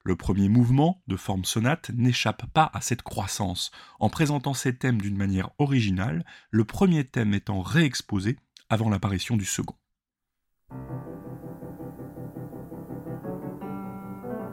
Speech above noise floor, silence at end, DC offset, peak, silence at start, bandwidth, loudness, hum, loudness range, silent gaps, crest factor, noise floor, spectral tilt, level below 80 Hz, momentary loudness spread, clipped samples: 60 dB; 0 s; under 0.1%; -6 dBFS; 0.05 s; 16 kHz; -26 LUFS; none; 13 LU; none; 20 dB; -85 dBFS; -5.5 dB/octave; -50 dBFS; 17 LU; under 0.1%